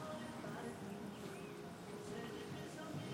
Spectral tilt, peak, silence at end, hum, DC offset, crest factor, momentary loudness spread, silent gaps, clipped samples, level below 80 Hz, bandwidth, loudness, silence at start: -5.5 dB/octave; -36 dBFS; 0 s; none; under 0.1%; 14 dB; 3 LU; none; under 0.1%; -76 dBFS; 16.5 kHz; -49 LUFS; 0 s